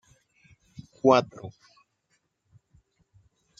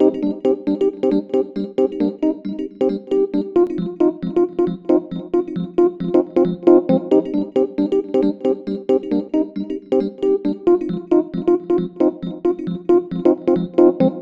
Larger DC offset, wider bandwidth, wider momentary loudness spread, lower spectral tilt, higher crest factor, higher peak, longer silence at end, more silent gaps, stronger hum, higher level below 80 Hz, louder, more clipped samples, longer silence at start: neither; first, 7.6 kHz vs 5.2 kHz; first, 28 LU vs 7 LU; second, -6 dB/octave vs -9.5 dB/octave; first, 26 dB vs 18 dB; second, -4 dBFS vs 0 dBFS; first, 2.1 s vs 0 s; neither; neither; second, -68 dBFS vs -58 dBFS; second, -23 LUFS vs -19 LUFS; neither; first, 1.05 s vs 0 s